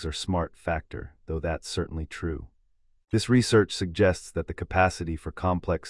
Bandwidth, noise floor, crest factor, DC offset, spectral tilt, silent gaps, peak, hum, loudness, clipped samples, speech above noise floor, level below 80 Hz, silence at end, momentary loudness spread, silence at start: 12 kHz; -64 dBFS; 20 dB; under 0.1%; -5.5 dB/octave; none; -6 dBFS; none; -27 LUFS; under 0.1%; 37 dB; -44 dBFS; 0 s; 11 LU; 0 s